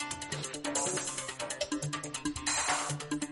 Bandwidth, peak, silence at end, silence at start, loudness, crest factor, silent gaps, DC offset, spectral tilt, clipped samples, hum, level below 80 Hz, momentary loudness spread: 11.5 kHz; -16 dBFS; 0 s; 0 s; -34 LUFS; 18 dB; none; under 0.1%; -2.5 dB/octave; under 0.1%; none; -60 dBFS; 7 LU